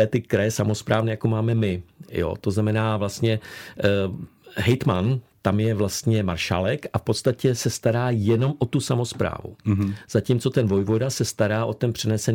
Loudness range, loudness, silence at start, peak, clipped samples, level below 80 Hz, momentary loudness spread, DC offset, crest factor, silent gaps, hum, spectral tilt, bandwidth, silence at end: 1 LU; -23 LUFS; 0 s; -4 dBFS; under 0.1%; -54 dBFS; 5 LU; under 0.1%; 18 dB; none; none; -6 dB/octave; 17 kHz; 0 s